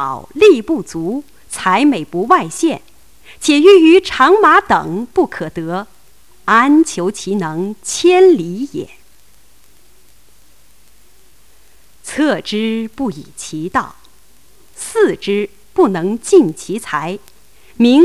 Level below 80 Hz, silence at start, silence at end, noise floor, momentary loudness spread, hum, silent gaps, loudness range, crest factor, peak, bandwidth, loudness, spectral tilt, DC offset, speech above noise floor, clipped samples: -50 dBFS; 0 s; 0 s; -51 dBFS; 16 LU; none; none; 11 LU; 14 dB; 0 dBFS; 14.5 kHz; -13 LUFS; -4.5 dB/octave; 0.9%; 38 dB; under 0.1%